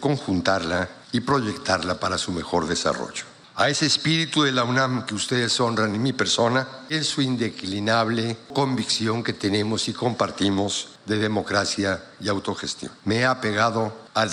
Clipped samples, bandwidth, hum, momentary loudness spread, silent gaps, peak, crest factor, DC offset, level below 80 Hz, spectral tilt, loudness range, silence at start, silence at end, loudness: under 0.1%; 12 kHz; none; 7 LU; none; -6 dBFS; 18 dB; under 0.1%; -58 dBFS; -4 dB/octave; 3 LU; 0 s; 0 s; -23 LUFS